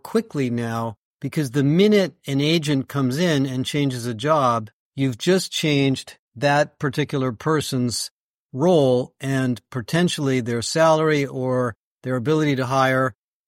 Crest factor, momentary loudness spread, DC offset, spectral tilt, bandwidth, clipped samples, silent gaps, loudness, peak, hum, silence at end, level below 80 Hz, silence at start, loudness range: 16 dB; 10 LU; under 0.1%; -5.5 dB/octave; 16.5 kHz; under 0.1%; 0.97-1.19 s, 4.73-4.92 s, 6.19-6.31 s, 8.11-8.49 s, 11.76-12.01 s; -21 LUFS; -4 dBFS; none; 0.35 s; -60 dBFS; 0.05 s; 2 LU